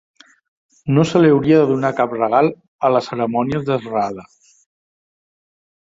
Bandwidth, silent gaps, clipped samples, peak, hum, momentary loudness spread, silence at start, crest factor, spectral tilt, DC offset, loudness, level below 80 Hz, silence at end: 7.8 kHz; 2.68-2.79 s; under 0.1%; -2 dBFS; none; 9 LU; 0.85 s; 16 dB; -7.5 dB/octave; under 0.1%; -17 LUFS; -54 dBFS; 1.75 s